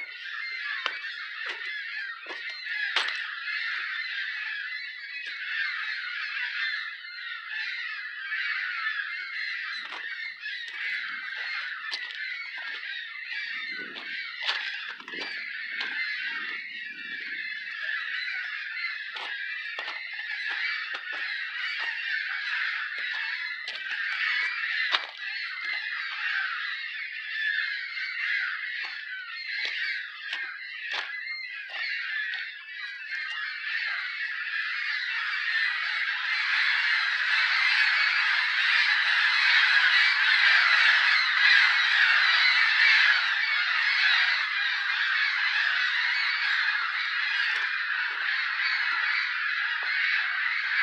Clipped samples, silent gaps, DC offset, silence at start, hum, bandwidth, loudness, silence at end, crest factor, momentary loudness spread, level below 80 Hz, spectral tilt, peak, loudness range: under 0.1%; none; under 0.1%; 0 s; none; 10.5 kHz; -26 LUFS; 0 s; 22 dB; 14 LU; under -90 dBFS; 2.5 dB/octave; -6 dBFS; 12 LU